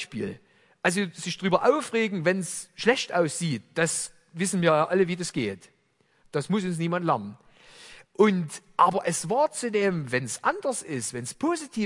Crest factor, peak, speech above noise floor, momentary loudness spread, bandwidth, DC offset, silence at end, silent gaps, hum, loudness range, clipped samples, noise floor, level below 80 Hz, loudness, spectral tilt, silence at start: 22 dB; -4 dBFS; 41 dB; 10 LU; 11.5 kHz; under 0.1%; 0 s; none; none; 3 LU; under 0.1%; -67 dBFS; -68 dBFS; -26 LUFS; -4.5 dB/octave; 0 s